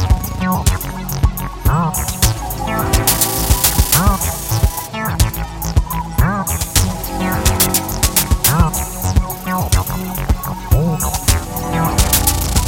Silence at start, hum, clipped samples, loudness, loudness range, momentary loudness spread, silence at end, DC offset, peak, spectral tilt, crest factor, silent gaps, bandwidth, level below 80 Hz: 0 s; none; under 0.1%; -16 LUFS; 3 LU; 8 LU; 0 s; under 0.1%; 0 dBFS; -4 dB/octave; 16 dB; none; 17 kHz; -20 dBFS